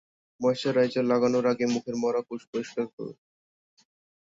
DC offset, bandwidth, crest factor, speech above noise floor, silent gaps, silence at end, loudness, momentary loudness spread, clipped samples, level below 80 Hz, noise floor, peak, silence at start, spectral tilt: under 0.1%; 7.8 kHz; 16 dB; over 64 dB; 2.47-2.53 s, 2.93-2.98 s; 1.2 s; -27 LUFS; 11 LU; under 0.1%; -70 dBFS; under -90 dBFS; -14 dBFS; 0.4 s; -5.5 dB/octave